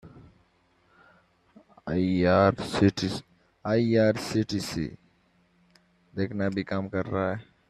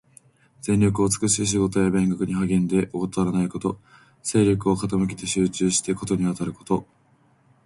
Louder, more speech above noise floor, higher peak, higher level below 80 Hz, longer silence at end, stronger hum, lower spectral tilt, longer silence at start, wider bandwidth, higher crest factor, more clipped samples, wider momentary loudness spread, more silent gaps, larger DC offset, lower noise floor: second, -27 LUFS vs -23 LUFS; about the same, 40 dB vs 38 dB; about the same, -8 dBFS vs -6 dBFS; second, -58 dBFS vs -48 dBFS; second, 0.25 s vs 0.8 s; neither; about the same, -6.5 dB/octave vs -5.5 dB/octave; second, 0.05 s vs 0.65 s; first, 13.5 kHz vs 11.5 kHz; about the same, 20 dB vs 16 dB; neither; first, 13 LU vs 7 LU; neither; neither; first, -66 dBFS vs -60 dBFS